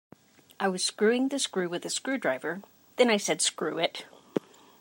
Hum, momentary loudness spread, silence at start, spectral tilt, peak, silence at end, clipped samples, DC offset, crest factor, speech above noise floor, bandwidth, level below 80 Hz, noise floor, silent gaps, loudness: none; 11 LU; 0.6 s; -2.5 dB/octave; -10 dBFS; 0.4 s; under 0.1%; under 0.1%; 20 dB; 29 dB; 16 kHz; -84 dBFS; -57 dBFS; none; -28 LUFS